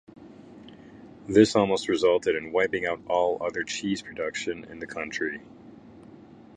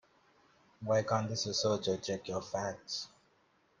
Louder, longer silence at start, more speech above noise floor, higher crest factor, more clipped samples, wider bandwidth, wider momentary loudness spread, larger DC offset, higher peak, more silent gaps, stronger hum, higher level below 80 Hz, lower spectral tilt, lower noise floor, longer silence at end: first, -26 LUFS vs -35 LUFS; second, 0.15 s vs 0.8 s; second, 23 dB vs 36 dB; about the same, 24 dB vs 20 dB; neither; about the same, 10.5 kHz vs 10 kHz; first, 14 LU vs 9 LU; neither; first, -4 dBFS vs -16 dBFS; neither; neither; first, -60 dBFS vs -72 dBFS; about the same, -4.5 dB/octave vs -4 dB/octave; second, -49 dBFS vs -71 dBFS; second, 0.55 s vs 0.75 s